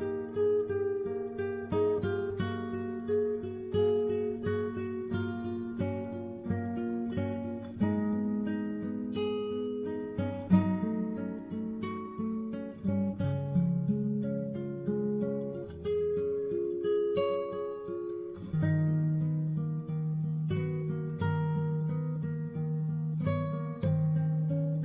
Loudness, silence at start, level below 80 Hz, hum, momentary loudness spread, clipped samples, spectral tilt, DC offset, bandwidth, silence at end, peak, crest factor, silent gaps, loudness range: -32 LUFS; 0 s; -56 dBFS; none; 7 LU; under 0.1%; -9 dB/octave; under 0.1%; 4 kHz; 0 s; -12 dBFS; 20 dB; none; 2 LU